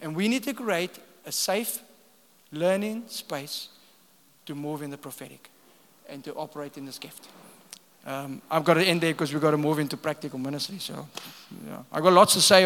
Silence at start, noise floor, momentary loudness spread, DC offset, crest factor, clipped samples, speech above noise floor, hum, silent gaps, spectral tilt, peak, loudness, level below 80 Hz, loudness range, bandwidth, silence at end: 0 s; -60 dBFS; 22 LU; under 0.1%; 26 dB; under 0.1%; 34 dB; none; none; -3.5 dB/octave; 0 dBFS; -26 LUFS; -80 dBFS; 13 LU; 18 kHz; 0 s